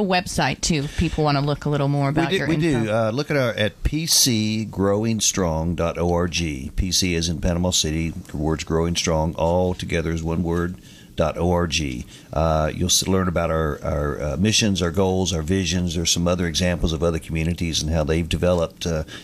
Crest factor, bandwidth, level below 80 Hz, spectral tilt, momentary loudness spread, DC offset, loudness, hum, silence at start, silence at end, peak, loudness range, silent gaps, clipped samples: 16 dB; 15.5 kHz; -34 dBFS; -4.5 dB/octave; 6 LU; under 0.1%; -21 LUFS; none; 0 s; 0 s; -4 dBFS; 3 LU; none; under 0.1%